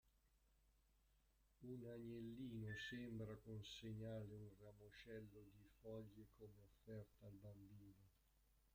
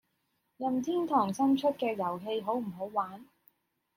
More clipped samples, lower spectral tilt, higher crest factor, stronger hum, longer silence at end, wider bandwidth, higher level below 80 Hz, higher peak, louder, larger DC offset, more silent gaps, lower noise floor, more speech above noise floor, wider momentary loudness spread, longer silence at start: neither; about the same, -6 dB/octave vs -6 dB/octave; about the same, 16 dB vs 18 dB; neither; second, 0.05 s vs 0.75 s; about the same, 16 kHz vs 16 kHz; about the same, -76 dBFS vs -78 dBFS; second, -42 dBFS vs -16 dBFS; second, -57 LUFS vs -31 LUFS; neither; neither; about the same, -80 dBFS vs -78 dBFS; second, 23 dB vs 47 dB; first, 13 LU vs 8 LU; second, 0.05 s vs 0.6 s